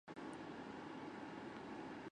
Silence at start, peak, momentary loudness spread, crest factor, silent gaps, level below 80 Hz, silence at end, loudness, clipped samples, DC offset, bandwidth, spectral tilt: 0.05 s; -38 dBFS; 1 LU; 12 dB; none; -78 dBFS; 0 s; -51 LUFS; under 0.1%; under 0.1%; 10 kHz; -5.5 dB/octave